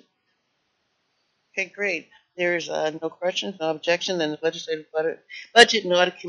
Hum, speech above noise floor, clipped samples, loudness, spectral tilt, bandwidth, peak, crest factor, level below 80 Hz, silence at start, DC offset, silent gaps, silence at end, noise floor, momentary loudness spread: none; 49 dB; under 0.1%; -23 LUFS; -0.5 dB/octave; 7.2 kHz; 0 dBFS; 24 dB; -70 dBFS; 1.55 s; under 0.1%; none; 0 s; -73 dBFS; 14 LU